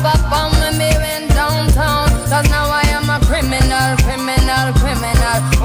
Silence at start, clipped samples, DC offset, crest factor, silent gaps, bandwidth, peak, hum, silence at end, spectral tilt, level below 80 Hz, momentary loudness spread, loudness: 0 s; under 0.1%; under 0.1%; 12 dB; none; 17.5 kHz; -2 dBFS; none; 0 s; -4.5 dB/octave; -16 dBFS; 2 LU; -14 LUFS